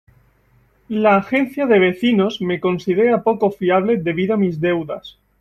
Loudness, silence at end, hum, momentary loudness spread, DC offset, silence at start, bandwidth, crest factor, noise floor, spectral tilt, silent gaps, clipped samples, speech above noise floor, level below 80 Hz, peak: -17 LUFS; 0.3 s; none; 6 LU; under 0.1%; 0.9 s; 13.5 kHz; 16 dB; -57 dBFS; -7.5 dB/octave; none; under 0.1%; 40 dB; -56 dBFS; -2 dBFS